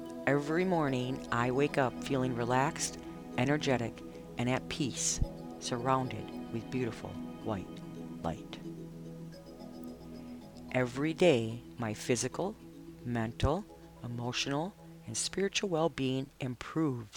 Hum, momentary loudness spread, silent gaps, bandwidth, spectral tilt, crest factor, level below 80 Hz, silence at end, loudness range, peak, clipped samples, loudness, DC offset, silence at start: none; 16 LU; none; 19 kHz; -4.5 dB/octave; 20 dB; -52 dBFS; 0 s; 9 LU; -14 dBFS; under 0.1%; -34 LUFS; under 0.1%; 0 s